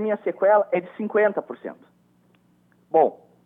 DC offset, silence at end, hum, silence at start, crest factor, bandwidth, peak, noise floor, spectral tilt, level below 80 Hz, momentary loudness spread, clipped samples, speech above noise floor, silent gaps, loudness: under 0.1%; 0.3 s; 60 Hz at -60 dBFS; 0 s; 18 dB; 3.8 kHz; -6 dBFS; -61 dBFS; -9 dB/octave; -80 dBFS; 17 LU; under 0.1%; 39 dB; none; -22 LUFS